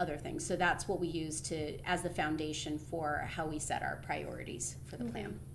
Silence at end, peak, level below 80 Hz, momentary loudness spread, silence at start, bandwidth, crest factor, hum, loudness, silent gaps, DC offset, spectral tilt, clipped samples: 0 s; -18 dBFS; -54 dBFS; 8 LU; 0 s; 12 kHz; 20 dB; none; -37 LUFS; none; under 0.1%; -4 dB/octave; under 0.1%